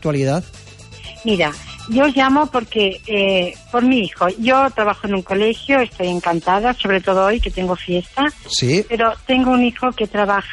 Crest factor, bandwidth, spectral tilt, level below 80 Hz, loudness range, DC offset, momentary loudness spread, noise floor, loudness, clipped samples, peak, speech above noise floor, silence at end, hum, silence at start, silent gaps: 12 dB; 11.5 kHz; -5 dB/octave; -38 dBFS; 1 LU; under 0.1%; 7 LU; -36 dBFS; -17 LUFS; under 0.1%; -4 dBFS; 19 dB; 0 s; none; 0 s; none